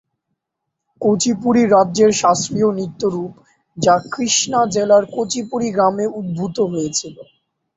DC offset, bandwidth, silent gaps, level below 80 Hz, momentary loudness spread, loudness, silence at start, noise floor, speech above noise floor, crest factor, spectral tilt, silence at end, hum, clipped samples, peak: under 0.1%; 8.2 kHz; none; -56 dBFS; 9 LU; -17 LUFS; 1 s; -79 dBFS; 62 dB; 16 dB; -4 dB/octave; 0.55 s; none; under 0.1%; -2 dBFS